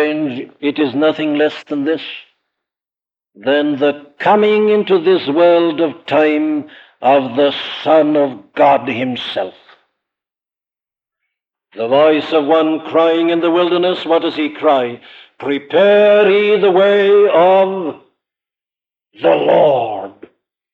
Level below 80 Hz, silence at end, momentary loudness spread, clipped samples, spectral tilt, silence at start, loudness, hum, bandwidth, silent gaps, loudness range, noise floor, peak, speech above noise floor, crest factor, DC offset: -68 dBFS; 0.6 s; 12 LU; under 0.1%; -7 dB/octave; 0 s; -14 LUFS; none; 6.8 kHz; none; 7 LU; under -90 dBFS; 0 dBFS; over 77 dB; 14 dB; under 0.1%